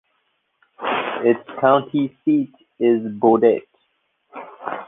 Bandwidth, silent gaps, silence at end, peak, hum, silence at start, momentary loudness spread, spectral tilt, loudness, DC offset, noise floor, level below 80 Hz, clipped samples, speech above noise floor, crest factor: 3.8 kHz; none; 0.05 s; -2 dBFS; none; 0.8 s; 16 LU; -9.5 dB/octave; -19 LUFS; under 0.1%; -69 dBFS; -66 dBFS; under 0.1%; 51 dB; 20 dB